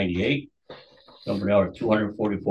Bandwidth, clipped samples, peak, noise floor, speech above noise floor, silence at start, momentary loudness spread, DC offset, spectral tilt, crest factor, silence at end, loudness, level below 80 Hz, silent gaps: 8 kHz; under 0.1%; -8 dBFS; -50 dBFS; 27 dB; 0 s; 11 LU; under 0.1%; -8 dB/octave; 18 dB; 0 s; -25 LUFS; -48 dBFS; none